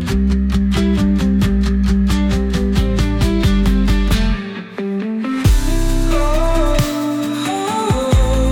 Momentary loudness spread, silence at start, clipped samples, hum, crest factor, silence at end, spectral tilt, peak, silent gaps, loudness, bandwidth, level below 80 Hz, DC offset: 5 LU; 0 s; under 0.1%; none; 12 dB; 0 s; -6.5 dB/octave; -4 dBFS; none; -17 LUFS; 18.5 kHz; -18 dBFS; under 0.1%